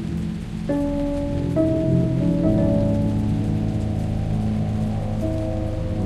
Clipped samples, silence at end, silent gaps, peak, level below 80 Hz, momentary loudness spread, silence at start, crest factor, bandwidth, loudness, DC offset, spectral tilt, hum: under 0.1%; 0 s; none; -8 dBFS; -32 dBFS; 6 LU; 0 s; 14 dB; 11.5 kHz; -23 LUFS; under 0.1%; -9 dB/octave; none